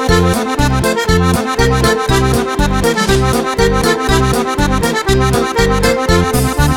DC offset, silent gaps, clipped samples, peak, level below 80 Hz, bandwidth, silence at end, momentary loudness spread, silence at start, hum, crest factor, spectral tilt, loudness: under 0.1%; none; under 0.1%; 0 dBFS; -20 dBFS; 20 kHz; 0 s; 2 LU; 0 s; none; 12 dB; -5 dB/octave; -13 LUFS